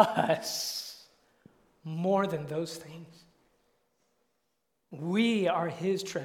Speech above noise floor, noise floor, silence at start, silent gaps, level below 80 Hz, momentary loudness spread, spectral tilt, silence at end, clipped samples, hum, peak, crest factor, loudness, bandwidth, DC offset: 50 dB; -80 dBFS; 0 s; none; -74 dBFS; 21 LU; -4.5 dB/octave; 0 s; under 0.1%; none; -6 dBFS; 26 dB; -30 LUFS; 18.5 kHz; under 0.1%